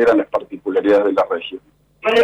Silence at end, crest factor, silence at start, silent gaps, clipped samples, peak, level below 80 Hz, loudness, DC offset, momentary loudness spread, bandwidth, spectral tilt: 0 s; 10 dB; 0 s; none; under 0.1%; -6 dBFS; -56 dBFS; -18 LUFS; under 0.1%; 12 LU; 9.2 kHz; -5 dB/octave